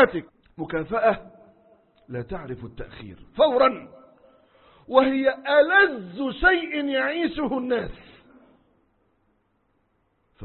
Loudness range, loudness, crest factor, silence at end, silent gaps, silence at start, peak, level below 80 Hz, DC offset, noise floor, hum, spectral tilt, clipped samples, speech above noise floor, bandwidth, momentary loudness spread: 9 LU; -22 LUFS; 22 dB; 0 s; none; 0 s; -2 dBFS; -48 dBFS; under 0.1%; -69 dBFS; none; -9.5 dB/octave; under 0.1%; 46 dB; 4.3 kHz; 19 LU